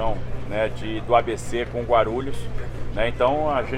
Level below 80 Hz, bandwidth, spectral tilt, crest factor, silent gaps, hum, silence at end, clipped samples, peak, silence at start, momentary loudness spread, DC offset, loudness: -34 dBFS; 11.5 kHz; -6 dB/octave; 18 dB; none; none; 0 s; under 0.1%; -4 dBFS; 0 s; 11 LU; under 0.1%; -24 LUFS